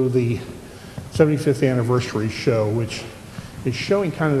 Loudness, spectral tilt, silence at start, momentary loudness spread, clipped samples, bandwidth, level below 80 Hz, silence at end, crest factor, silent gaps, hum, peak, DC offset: -21 LUFS; -7 dB/octave; 0 s; 18 LU; under 0.1%; 13.5 kHz; -48 dBFS; 0 s; 20 dB; none; none; 0 dBFS; under 0.1%